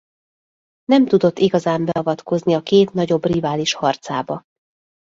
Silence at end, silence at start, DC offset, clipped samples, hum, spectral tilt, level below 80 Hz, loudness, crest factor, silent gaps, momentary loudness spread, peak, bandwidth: 0.75 s; 0.9 s; under 0.1%; under 0.1%; none; -6 dB/octave; -56 dBFS; -18 LUFS; 16 dB; none; 9 LU; -2 dBFS; 7.8 kHz